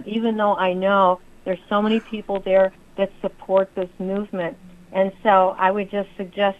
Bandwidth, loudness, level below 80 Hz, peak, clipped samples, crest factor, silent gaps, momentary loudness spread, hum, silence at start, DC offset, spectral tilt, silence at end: 5.2 kHz; -21 LUFS; -52 dBFS; -2 dBFS; under 0.1%; 18 dB; none; 11 LU; none; 0 s; under 0.1%; -7.5 dB/octave; 0.05 s